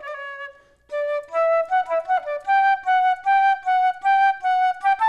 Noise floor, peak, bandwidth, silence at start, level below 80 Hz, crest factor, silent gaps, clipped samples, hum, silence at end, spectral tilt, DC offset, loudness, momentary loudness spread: -41 dBFS; -10 dBFS; 8 kHz; 0 s; -66 dBFS; 10 dB; none; under 0.1%; none; 0 s; -1 dB/octave; under 0.1%; -20 LUFS; 14 LU